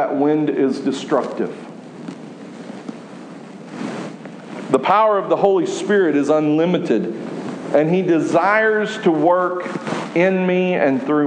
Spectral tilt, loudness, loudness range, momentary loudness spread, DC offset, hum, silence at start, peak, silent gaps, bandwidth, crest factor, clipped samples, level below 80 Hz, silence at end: -6.5 dB/octave; -18 LUFS; 10 LU; 19 LU; under 0.1%; none; 0 s; -2 dBFS; none; 10 kHz; 16 dB; under 0.1%; -72 dBFS; 0 s